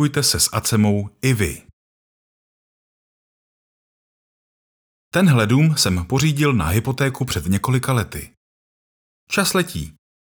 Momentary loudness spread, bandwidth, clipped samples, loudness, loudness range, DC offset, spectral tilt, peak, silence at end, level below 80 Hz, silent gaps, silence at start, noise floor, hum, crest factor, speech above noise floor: 10 LU; over 20 kHz; under 0.1%; -19 LUFS; 9 LU; under 0.1%; -4.5 dB/octave; -4 dBFS; 0.4 s; -44 dBFS; 1.73-5.11 s, 8.37-9.27 s; 0 s; under -90 dBFS; none; 18 dB; over 72 dB